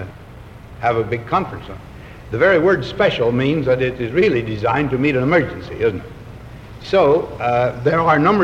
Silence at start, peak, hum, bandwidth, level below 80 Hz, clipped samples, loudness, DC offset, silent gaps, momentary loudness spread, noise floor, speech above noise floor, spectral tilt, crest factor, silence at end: 0 s; -2 dBFS; none; 10 kHz; -42 dBFS; under 0.1%; -17 LUFS; under 0.1%; none; 21 LU; -38 dBFS; 21 dB; -7.5 dB/octave; 16 dB; 0 s